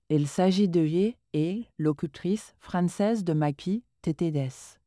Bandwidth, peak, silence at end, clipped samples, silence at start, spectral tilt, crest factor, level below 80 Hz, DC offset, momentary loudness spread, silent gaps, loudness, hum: 11 kHz; -12 dBFS; 0.15 s; under 0.1%; 0.1 s; -7 dB/octave; 14 dB; -62 dBFS; under 0.1%; 8 LU; none; -28 LUFS; none